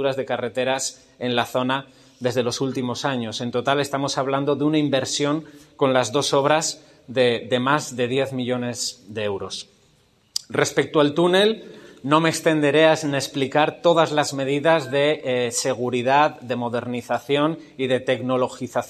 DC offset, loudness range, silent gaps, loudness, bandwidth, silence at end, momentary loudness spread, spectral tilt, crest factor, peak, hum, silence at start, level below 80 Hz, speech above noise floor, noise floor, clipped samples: under 0.1%; 5 LU; none; -22 LUFS; 14 kHz; 0 s; 9 LU; -4 dB/octave; 20 dB; -2 dBFS; none; 0 s; -64 dBFS; 38 dB; -59 dBFS; under 0.1%